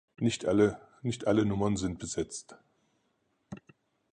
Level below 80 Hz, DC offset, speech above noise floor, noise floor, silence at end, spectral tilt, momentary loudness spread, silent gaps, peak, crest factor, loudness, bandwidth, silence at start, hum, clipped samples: -56 dBFS; under 0.1%; 46 dB; -75 dBFS; 0.55 s; -5.5 dB/octave; 22 LU; none; -12 dBFS; 20 dB; -30 LUFS; 10.5 kHz; 0.2 s; none; under 0.1%